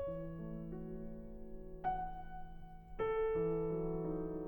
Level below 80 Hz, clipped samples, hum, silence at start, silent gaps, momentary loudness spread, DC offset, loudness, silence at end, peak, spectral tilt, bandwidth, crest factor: -52 dBFS; under 0.1%; none; 0 s; none; 17 LU; under 0.1%; -41 LUFS; 0 s; -28 dBFS; -10.5 dB/octave; 19 kHz; 14 dB